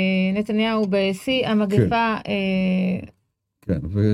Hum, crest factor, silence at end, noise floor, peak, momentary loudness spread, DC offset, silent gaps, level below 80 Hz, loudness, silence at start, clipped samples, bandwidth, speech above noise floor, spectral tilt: none; 16 dB; 0 s; -63 dBFS; -4 dBFS; 7 LU; under 0.1%; none; -50 dBFS; -21 LUFS; 0 s; under 0.1%; 12.5 kHz; 43 dB; -7 dB/octave